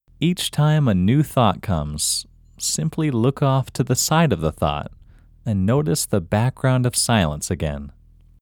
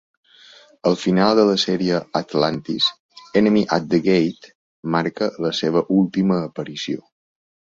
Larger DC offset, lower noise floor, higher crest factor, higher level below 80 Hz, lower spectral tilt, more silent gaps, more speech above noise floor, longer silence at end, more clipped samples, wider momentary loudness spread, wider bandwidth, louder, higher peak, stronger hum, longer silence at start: neither; about the same, -48 dBFS vs -48 dBFS; about the same, 18 dB vs 18 dB; first, -40 dBFS vs -58 dBFS; about the same, -5 dB/octave vs -6 dB/octave; second, none vs 3.00-3.09 s, 4.55-4.83 s; about the same, 29 dB vs 29 dB; second, 0.5 s vs 0.75 s; neither; about the same, 8 LU vs 10 LU; first, 19.5 kHz vs 7.8 kHz; about the same, -20 LUFS vs -20 LUFS; about the same, -2 dBFS vs -2 dBFS; neither; second, 0.2 s vs 0.85 s